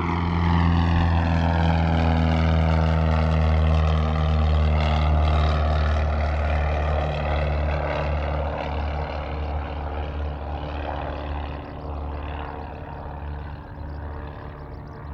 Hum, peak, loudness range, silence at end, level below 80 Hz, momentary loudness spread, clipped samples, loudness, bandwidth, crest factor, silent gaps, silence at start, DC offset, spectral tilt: none; -8 dBFS; 12 LU; 0 s; -28 dBFS; 14 LU; under 0.1%; -23 LUFS; 6.4 kHz; 14 dB; none; 0 s; under 0.1%; -8 dB/octave